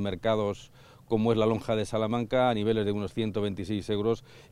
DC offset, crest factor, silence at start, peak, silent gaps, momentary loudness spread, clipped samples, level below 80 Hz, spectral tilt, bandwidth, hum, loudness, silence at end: under 0.1%; 16 dB; 0 s; -12 dBFS; none; 7 LU; under 0.1%; -54 dBFS; -7 dB/octave; 12.5 kHz; none; -28 LUFS; 0.1 s